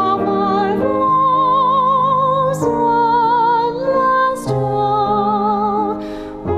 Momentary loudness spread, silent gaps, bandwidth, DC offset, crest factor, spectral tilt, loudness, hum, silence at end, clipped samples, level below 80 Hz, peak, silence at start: 5 LU; none; 13.5 kHz; under 0.1%; 10 dB; -6.5 dB/octave; -15 LUFS; none; 0 s; under 0.1%; -44 dBFS; -4 dBFS; 0 s